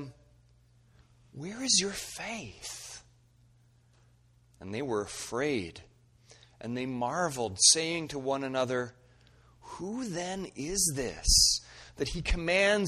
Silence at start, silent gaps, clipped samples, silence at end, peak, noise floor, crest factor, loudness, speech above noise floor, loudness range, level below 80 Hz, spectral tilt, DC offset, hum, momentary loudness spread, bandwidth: 0 s; none; under 0.1%; 0 s; -8 dBFS; -63 dBFS; 24 dB; -29 LUFS; 33 dB; 9 LU; -44 dBFS; -2 dB/octave; under 0.1%; none; 21 LU; 14 kHz